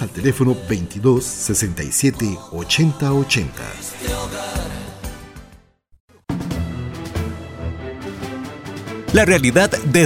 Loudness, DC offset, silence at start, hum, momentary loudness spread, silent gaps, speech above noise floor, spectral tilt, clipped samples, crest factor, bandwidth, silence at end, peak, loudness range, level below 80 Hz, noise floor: -20 LUFS; under 0.1%; 0 s; none; 15 LU; 6.00-6.08 s; 32 dB; -4.5 dB/octave; under 0.1%; 18 dB; 16.5 kHz; 0 s; -2 dBFS; 10 LU; -36 dBFS; -49 dBFS